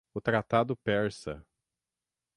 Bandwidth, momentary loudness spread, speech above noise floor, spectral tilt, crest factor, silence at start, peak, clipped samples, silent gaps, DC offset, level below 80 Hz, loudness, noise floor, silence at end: 11.5 kHz; 14 LU; over 60 dB; -6.5 dB/octave; 20 dB; 0.15 s; -12 dBFS; under 0.1%; none; under 0.1%; -60 dBFS; -29 LUFS; under -90 dBFS; 0.95 s